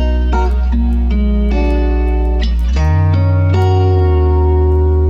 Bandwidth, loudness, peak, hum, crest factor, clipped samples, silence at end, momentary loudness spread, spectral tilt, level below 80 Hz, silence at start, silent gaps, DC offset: 6.8 kHz; -14 LUFS; -2 dBFS; none; 8 dB; under 0.1%; 0 s; 4 LU; -9 dB/octave; -14 dBFS; 0 s; none; under 0.1%